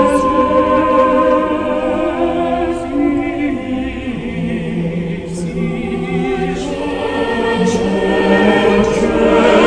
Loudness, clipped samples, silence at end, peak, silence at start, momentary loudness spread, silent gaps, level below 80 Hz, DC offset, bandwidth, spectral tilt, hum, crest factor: -15 LUFS; under 0.1%; 0 s; 0 dBFS; 0 s; 9 LU; none; -34 dBFS; under 0.1%; 10.5 kHz; -6 dB/octave; none; 14 dB